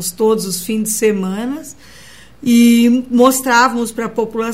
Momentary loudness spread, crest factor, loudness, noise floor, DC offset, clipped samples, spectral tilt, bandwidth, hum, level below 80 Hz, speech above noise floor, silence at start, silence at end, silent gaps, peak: 13 LU; 14 dB; -14 LUFS; -41 dBFS; 0.6%; under 0.1%; -4 dB/octave; 16.5 kHz; none; -52 dBFS; 27 dB; 0 s; 0 s; none; 0 dBFS